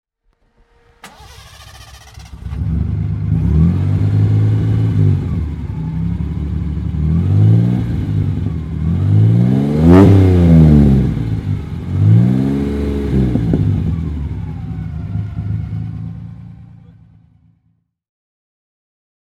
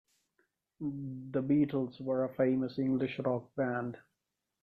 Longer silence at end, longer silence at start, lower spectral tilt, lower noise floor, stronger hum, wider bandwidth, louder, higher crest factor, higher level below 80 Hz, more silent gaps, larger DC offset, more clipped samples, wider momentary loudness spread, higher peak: first, 2.75 s vs 0.65 s; first, 1.05 s vs 0.8 s; about the same, -10 dB/octave vs -10 dB/octave; second, -62 dBFS vs -87 dBFS; neither; first, 6.6 kHz vs 4.9 kHz; first, -14 LUFS vs -34 LUFS; about the same, 14 dB vs 16 dB; first, -26 dBFS vs -70 dBFS; neither; neither; neither; first, 15 LU vs 12 LU; first, 0 dBFS vs -18 dBFS